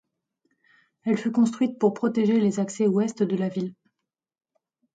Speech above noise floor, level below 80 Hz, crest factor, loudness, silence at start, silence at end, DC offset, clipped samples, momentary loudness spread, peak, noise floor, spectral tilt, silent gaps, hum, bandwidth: 60 dB; -74 dBFS; 16 dB; -24 LUFS; 1.05 s; 1.25 s; under 0.1%; under 0.1%; 7 LU; -10 dBFS; -83 dBFS; -7 dB/octave; none; none; 9.2 kHz